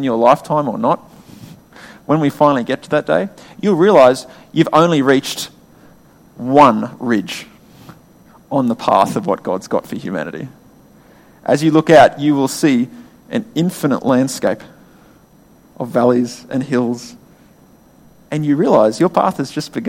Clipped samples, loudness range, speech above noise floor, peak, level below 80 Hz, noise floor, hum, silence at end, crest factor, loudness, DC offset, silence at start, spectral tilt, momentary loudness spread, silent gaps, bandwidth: under 0.1%; 6 LU; 33 dB; 0 dBFS; -56 dBFS; -48 dBFS; none; 0 s; 16 dB; -15 LUFS; under 0.1%; 0 s; -6 dB/octave; 15 LU; none; 16.5 kHz